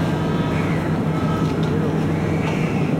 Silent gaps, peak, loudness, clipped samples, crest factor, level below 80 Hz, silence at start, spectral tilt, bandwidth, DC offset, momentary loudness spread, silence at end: none; -8 dBFS; -21 LUFS; under 0.1%; 12 dB; -42 dBFS; 0 s; -7.5 dB/octave; 13 kHz; under 0.1%; 1 LU; 0 s